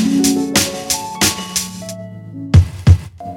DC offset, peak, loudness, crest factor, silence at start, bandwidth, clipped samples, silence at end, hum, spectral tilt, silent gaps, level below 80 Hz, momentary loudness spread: under 0.1%; 0 dBFS; -15 LUFS; 16 dB; 0 s; 17.5 kHz; 0.2%; 0 s; none; -4.5 dB/octave; none; -28 dBFS; 16 LU